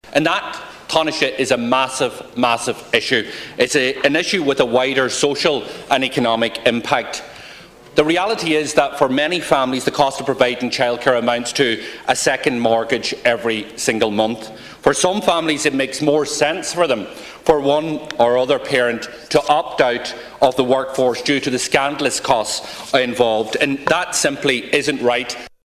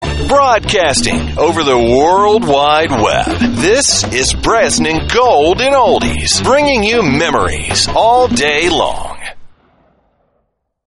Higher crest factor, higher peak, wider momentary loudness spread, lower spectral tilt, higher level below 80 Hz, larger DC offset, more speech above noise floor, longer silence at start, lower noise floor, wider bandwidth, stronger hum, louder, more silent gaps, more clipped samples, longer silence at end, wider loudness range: first, 18 dB vs 12 dB; about the same, 0 dBFS vs 0 dBFS; about the same, 6 LU vs 4 LU; about the same, -3 dB/octave vs -3.5 dB/octave; second, -52 dBFS vs -28 dBFS; neither; second, 22 dB vs 53 dB; about the same, 0.05 s vs 0 s; second, -40 dBFS vs -64 dBFS; first, 16 kHz vs 11.5 kHz; neither; second, -17 LUFS vs -11 LUFS; neither; neither; second, 0.2 s vs 1.4 s; about the same, 1 LU vs 3 LU